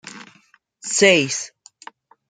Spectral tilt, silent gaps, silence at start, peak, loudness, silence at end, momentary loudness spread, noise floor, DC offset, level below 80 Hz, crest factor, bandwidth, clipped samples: -2.5 dB/octave; none; 0.05 s; -2 dBFS; -17 LUFS; 0.8 s; 21 LU; -57 dBFS; under 0.1%; -68 dBFS; 20 dB; 9.6 kHz; under 0.1%